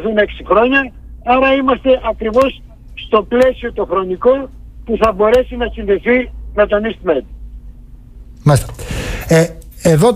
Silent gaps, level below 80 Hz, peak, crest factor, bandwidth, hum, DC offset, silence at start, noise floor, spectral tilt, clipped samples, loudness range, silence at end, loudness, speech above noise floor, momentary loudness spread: none; -32 dBFS; -2 dBFS; 12 dB; 15.5 kHz; none; under 0.1%; 0 s; -35 dBFS; -6 dB/octave; under 0.1%; 3 LU; 0 s; -14 LUFS; 22 dB; 12 LU